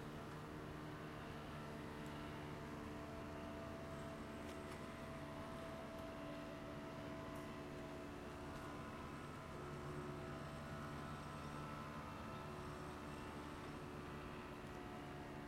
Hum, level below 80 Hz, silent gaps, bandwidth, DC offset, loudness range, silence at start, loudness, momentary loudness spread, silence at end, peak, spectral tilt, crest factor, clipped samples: none; -64 dBFS; none; 16 kHz; under 0.1%; 1 LU; 0 s; -51 LUFS; 2 LU; 0 s; -36 dBFS; -6 dB/octave; 14 dB; under 0.1%